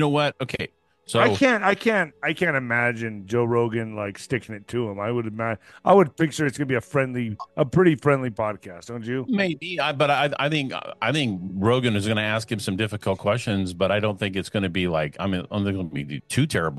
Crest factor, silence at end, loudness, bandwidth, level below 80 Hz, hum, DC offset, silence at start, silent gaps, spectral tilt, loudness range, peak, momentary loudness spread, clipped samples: 20 dB; 0 s; -23 LUFS; 12.5 kHz; -56 dBFS; none; under 0.1%; 0 s; none; -5.5 dB/octave; 3 LU; -4 dBFS; 10 LU; under 0.1%